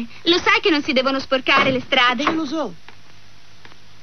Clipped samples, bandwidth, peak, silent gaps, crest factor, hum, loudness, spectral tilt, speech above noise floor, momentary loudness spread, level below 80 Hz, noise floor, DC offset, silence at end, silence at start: under 0.1%; 6.6 kHz; -2 dBFS; none; 18 dB; none; -17 LUFS; -3.5 dB/octave; 30 dB; 9 LU; -54 dBFS; -49 dBFS; 2%; 1.3 s; 0 s